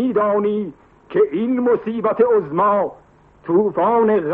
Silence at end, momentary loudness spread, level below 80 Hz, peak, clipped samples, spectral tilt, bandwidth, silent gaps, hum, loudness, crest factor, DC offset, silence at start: 0 s; 9 LU; -58 dBFS; -4 dBFS; under 0.1%; -7 dB/octave; 3.8 kHz; none; none; -18 LUFS; 14 dB; under 0.1%; 0 s